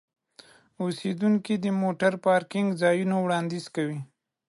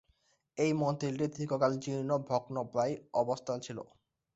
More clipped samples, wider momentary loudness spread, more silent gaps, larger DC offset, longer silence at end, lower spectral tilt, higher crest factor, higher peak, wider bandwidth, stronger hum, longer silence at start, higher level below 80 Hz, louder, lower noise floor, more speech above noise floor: neither; about the same, 9 LU vs 10 LU; neither; neither; about the same, 0.45 s vs 0.5 s; about the same, -6.5 dB/octave vs -6.5 dB/octave; about the same, 16 dB vs 18 dB; first, -10 dBFS vs -16 dBFS; first, 11.5 kHz vs 8.2 kHz; neither; first, 0.8 s vs 0.55 s; about the same, -74 dBFS vs -72 dBFS; first, -26 LUFS vs -34 LUFS; second, -55 dBFS vs -73 dBFS; second, 30 dB vs 40 dB